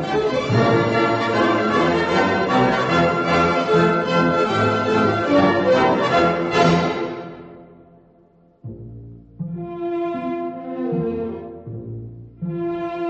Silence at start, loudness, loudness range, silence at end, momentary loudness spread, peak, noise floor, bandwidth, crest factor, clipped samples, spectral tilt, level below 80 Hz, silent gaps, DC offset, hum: 0 s; -19 LUFS; 12 LU; 0 s; 17 LU; -4 dBFS; -54 dBFS; 8.4 kHz; 16 dB; under 0.1%; -6.5 dB/octave; -46 dBFS; none; under 0.1%; none